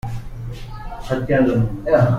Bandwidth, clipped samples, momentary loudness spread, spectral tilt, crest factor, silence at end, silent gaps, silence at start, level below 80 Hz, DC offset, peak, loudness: 10 kHz; under 0.1%; 17 LU; -8.5 dB/octave; 16 dB; 0 s; none; 0.05 s; -34 dBFS; under 0.1%; -4 dBFS; -19 LUFS